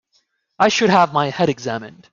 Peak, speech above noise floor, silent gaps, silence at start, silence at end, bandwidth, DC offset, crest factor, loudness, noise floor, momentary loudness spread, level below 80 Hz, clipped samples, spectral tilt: -2 dBFS; 48 dB; none; 0.6 s; 0.25 s; 7.8 kHz; under 0.1%; 16 dB; -17 LUFS; -65 dBFS; 12 LU; -60 dBFS; under 0.1%; -4.5 dB/octave